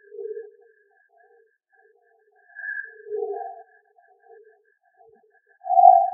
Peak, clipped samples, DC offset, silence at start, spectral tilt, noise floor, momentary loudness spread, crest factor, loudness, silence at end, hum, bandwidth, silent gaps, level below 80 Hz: 0 dBFS; under 0.1%; under 0.1%; 0.15 s; 9.5 dB/octave; -62 dBFS; 26 LU; 26 dB; -22 LUFS; 0 s; none; 1.9 kHz; none; under -90 dBFS